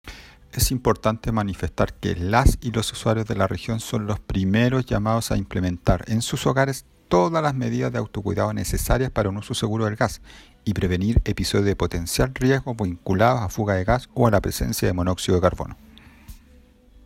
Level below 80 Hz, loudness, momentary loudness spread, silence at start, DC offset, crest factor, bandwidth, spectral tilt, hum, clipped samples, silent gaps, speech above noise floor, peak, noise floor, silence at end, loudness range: -32 dBFS; -23 LUFS; 7 LU; 0.05 s; under 0.1%; 20 dB; 16.5 kHz; -5.5 dB/octave; none; under 0.1%; none; 30 dB; -4 dBFS; -52 dBFS; 0.65 s; 2 LU